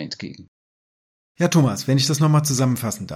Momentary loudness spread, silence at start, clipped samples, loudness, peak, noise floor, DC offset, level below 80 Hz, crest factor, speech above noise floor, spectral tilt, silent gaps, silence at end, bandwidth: 14 LU; 0 s; under 0.1%; -19 LUFS; -4 dBFS; under -90 dBFS; under 0.1%; -60 dBFS; 16 dB; over 70 dB; -5 dB/octave; 0.48-1.35 s; 0 s; 15.5 kHz